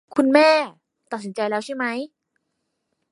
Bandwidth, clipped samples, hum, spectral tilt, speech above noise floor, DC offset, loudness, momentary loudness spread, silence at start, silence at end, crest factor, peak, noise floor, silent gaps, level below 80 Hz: 11.5 kHz; under 0.1%; none; -4.5 dB/octave; 56 dB; under 0.1%; -20 LUFS; 18 LU; 0.1 s; 1.05 s; 20 dB; -2 dBFS; -76 dBFS; none; -78 dBFS